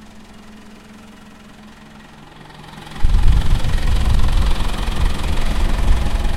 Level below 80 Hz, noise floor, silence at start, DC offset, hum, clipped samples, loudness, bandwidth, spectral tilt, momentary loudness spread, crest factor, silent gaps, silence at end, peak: -18 dBFS; -40 dBFS; 0.15 s; under 0.1%; none; under 0.1%; -21 LUFS; 12.5 kHz; -5.5 dB/octave; 22 LU; 16 dB; none; 0 s; 0 dBFS